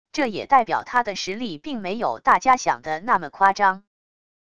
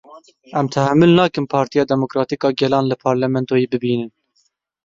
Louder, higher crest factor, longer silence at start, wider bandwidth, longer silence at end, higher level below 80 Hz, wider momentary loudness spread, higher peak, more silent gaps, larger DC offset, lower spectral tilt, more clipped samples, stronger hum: second, -21 LUFS vs -17 LUFS; about the same, 20 dB vs 16 dB; about the same, 0.15 s vs 0.1 s; first, 10.5 kHz vs 7.6 kHz; about the same, 0.75 s vs 0.75 s; about the same, -58 dBFS vs -56 dBFS; about the same, 11 LU vs 9 LU; about the same, -2 dBFS vs -2 dBFS; neither; first, 0.5% vs under 0.1%; second, -3.5 dB/octave vs -7 dB/octave; neither; neither